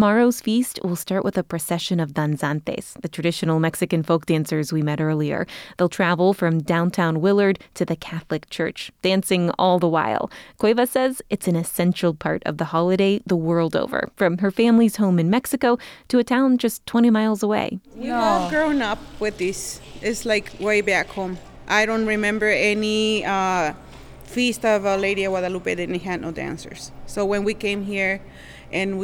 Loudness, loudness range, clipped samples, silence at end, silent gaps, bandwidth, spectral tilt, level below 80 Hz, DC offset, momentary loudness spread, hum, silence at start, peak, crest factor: -21 LUFS; 4 LU; under 0.1%; 0 s; none; 17.5 kHz; -5.5 dB/octave; -50 dBFS; under 0.1%; 10 LU; none; 0 s; -6 dBFS; 14 dB